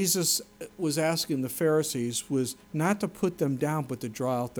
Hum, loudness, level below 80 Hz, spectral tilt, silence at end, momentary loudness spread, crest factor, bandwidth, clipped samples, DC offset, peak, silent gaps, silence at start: none; -28 LUFS; -64 dBFS; -4 dB/octave; 0 s; 7 LU; 16 dB; over 20 kHz; under 0.1%; under 0.1%; -12 dBFS; none; 0 s